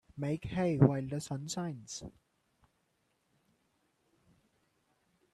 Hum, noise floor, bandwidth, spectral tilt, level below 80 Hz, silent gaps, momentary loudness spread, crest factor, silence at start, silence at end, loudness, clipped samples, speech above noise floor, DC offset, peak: none; -78 dBFS; 12.5 kHz; -6.5 dB/octave; -62 dBFS; none; 17 LU; 26 dB; 0.15 s; 3.25 s; -33 LUFS; under 0.1%; 45 dB; under 0.1%; -10 dBFS